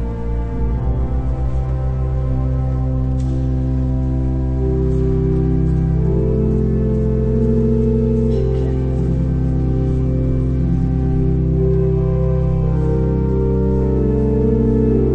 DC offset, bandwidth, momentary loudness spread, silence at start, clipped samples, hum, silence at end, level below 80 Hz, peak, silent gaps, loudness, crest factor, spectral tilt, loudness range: under 0.1%; 3.4 kHz; 4 LU; 0 s; under 0.1%; none; 0 s; -20 dBFS; -4 dBFS; none; -18 LUFS; 12 dB; -11 dB/octave; 3 LU